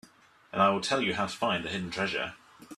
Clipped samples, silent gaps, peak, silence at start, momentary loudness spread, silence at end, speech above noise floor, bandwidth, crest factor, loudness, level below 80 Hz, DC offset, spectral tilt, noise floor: under 0.1%; none; -10 dBFS; 0.55 s; 8 LU; 0.05 s; 29 dB; 13.5 kHz; 20 dB; -29 LUFS; -64 dBFS; under 0.1%; -4 dB/octave; -58 dBFS